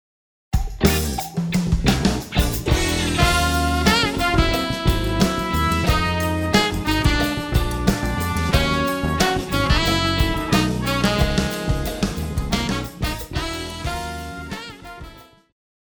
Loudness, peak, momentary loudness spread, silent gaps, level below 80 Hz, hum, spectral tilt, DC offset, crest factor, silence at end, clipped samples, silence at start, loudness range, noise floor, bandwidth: -20 LUFS; -2 dBFS; 9 LU; none; -28 dBFS; none; -4.5 dB/octave; under 0.1%; 20 dB; 0.75 s; under 0.1%; 0.5 s; 7 LU; -42 dBFS; over 20 kHz